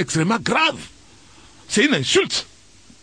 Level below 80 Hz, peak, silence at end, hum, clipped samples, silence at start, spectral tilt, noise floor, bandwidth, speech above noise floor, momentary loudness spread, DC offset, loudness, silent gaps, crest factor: -54 dBFS; -2 dBFS; 0.6 s; none; under 0.1%; 0 s; -3.5 dB/octave; -50 dBFS; 10.5 kHz; 30 dB; 10 LU; 0.2%; -19 LUFS; none; 20 dB